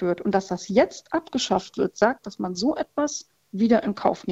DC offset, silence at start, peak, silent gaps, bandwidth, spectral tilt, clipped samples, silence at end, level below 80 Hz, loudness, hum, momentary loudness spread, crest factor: under 0.1%; 0 s; -4 dBFS; none; 8.2 kHz; -5 dB/octave; under 0.1%; 0 s; -58 dBFS; -24 LUFS; none; 8 LU; 20 dB